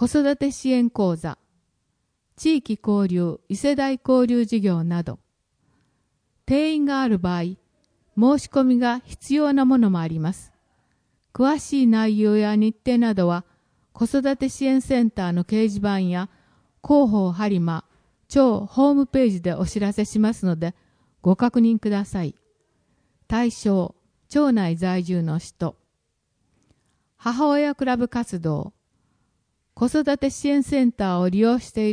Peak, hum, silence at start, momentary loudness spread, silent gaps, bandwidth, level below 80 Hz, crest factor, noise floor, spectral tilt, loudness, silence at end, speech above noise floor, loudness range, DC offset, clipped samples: -4 dBFS; none; 0 s; 10 LU; none; 10.5 kHz; -50 dBFS; 18 dB; -73 dBFS; -7 dB/octave; -21 LUFS; 0 s; 53 dB; 5 LU; under 0.1%; under 0.1%